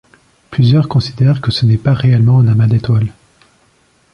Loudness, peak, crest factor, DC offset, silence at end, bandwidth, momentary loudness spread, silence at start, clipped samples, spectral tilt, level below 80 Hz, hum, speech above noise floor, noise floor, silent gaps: -12 LUFS; -2 dBFS; 10 dB; under 0.1%; 1 s; 6.6 kHz; 6 LU; 0.5 s; under 0.1%; -8 dB/octave; -40 dBFS; none; 43 dB; -53 dBFS; none